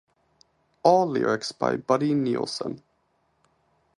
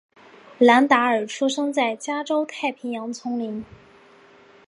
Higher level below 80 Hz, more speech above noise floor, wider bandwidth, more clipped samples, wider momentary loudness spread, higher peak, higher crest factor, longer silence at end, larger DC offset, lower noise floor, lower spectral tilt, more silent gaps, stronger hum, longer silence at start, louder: about the same, -68 dBFS vs -68 dBFS; first, 46 dB vs 30 dB; about the same, 11.5 kHz vs 11 kHz; neither; about the same, 12 LU vs 14 LU; about the same, -4 dBFS vs -2 dBFS; about the same, 22 dB vs 20 dB; first, 1.2 s vs 1.05 s; neither; first, -70 dBFS vs -51 dBFS; first, -5.5 dB/octave vs -3.5 dB/octave; neither; neither; first, 0.85 s vs 0.5 s; second, -24 LUFS vs -21 LUFS